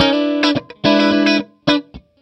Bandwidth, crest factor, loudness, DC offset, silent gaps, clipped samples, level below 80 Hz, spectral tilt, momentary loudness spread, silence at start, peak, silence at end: 8.4 kHz; 16 dB; -16 LUFS; under 0.1%; none; under 0.1%; -50 dBFS; -5 dB/octave; 5 LU; 0 s; 0 dBFS; 0.25 s